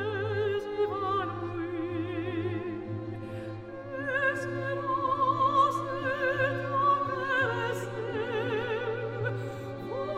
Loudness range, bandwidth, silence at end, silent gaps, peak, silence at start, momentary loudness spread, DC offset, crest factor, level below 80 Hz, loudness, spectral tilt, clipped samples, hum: 6 LU; 15 kHz; 0 s; none; -12 dBFS; 0 s; 12 LU; under 0.1%; 18 dB; -60 dBFS; -30 LUFS; -6.5 dB/octave; under 0.1%; none